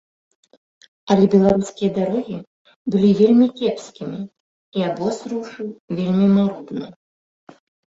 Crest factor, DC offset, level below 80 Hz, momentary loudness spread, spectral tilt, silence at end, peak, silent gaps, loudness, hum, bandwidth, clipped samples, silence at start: 18 dB; under 0.1%; -56 dBFS; 17 LU; -7.5 dB/octave; 1.05 s; -2 dBFS; 2.47-2.65 s, 2.76-2.85 s, 4.40-4.72 s, 5.80-5.88 s; -19 LUFS; none; 7.8 kHz; under 0.1%; 1.05 s